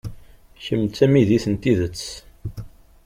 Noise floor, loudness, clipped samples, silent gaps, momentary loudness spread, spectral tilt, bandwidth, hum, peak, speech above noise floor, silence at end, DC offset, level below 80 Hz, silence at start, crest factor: -44 dBFS; -20 LUFS; under 0.1%; none; 20 LU; -7 dB/octave; 16 kHz; none; -4 dBFS; 25 dB; 0.4 s; under 0.1%; -44 dBFS; 0.05 s; 18 dB